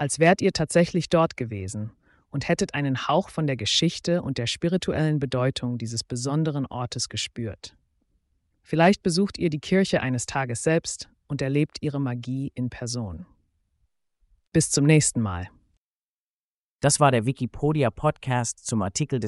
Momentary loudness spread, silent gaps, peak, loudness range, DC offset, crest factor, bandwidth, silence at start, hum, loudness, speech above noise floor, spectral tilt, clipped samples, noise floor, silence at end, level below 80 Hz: 12 LU; 15.77-16.79 s; -6 dBFS; 5 LU; under 0.1%; 20 dB; 11.5 kHz; 0 s; none; -24 LUFS; over 66 dB; -5 dB/octave; under 0.1%; under -90 dBFS; 0 s; -52 dBFS